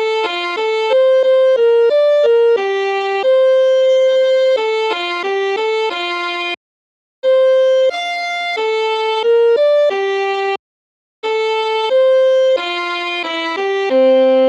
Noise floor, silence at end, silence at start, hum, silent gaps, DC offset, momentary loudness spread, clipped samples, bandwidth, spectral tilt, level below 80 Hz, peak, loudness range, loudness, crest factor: under -90 dBFS; 0 s; 0 s; none; 6.57-7.23 s, 10.59-11.22 s; under 0.1%; 7 LU; under 0.1%; 8.4 kHz; -1.5 dB/octave; -82 dBFS; -2 dBFS; 4 LU; -14 LUFS; 12 dB